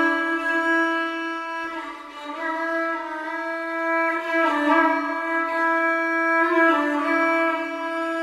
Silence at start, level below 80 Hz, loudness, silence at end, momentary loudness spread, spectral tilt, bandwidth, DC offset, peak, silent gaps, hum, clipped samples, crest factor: 0 s; -68 dBFS; -22 LUFS; 0 s; 10 LU; -2.5 dB/octave; 13.5 kHz; under 0.1%; -6 dBFS; none; none; under 0.1%; 16 dB